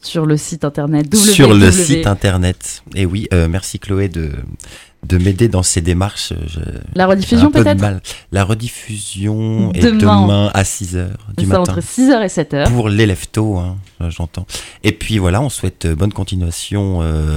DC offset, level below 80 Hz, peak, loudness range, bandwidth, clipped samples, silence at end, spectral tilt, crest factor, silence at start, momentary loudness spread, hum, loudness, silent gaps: under 0.1%; -30 dBFS; 0 dBFS; 6 LU; 16.5 kHz; 0.2%; 0 s; -5.5 dB/octave; 14 dB; 0.05 s; 14 LU; none; -14 LUFS; none